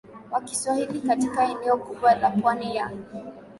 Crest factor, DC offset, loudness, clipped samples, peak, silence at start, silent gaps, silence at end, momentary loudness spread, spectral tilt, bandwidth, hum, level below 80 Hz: 16 dB; under 0.1%; -24 LUFS; under 0.1%; -8 dBFS; 0.05 s; none; 0 s; 12 LU; -4.5 dB/octave; 11.5 kHz; none; -62 dBFS